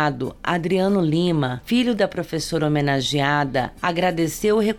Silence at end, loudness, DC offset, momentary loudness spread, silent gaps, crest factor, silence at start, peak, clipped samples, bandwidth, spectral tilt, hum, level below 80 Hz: 0 s; -21 LUFS; under 0.1%; 5 LU; none; 14 dB; 0 s; -6 dBFS; under 0.1%; 18 kHz; -5.5 dB/octave; none; -46 dBFS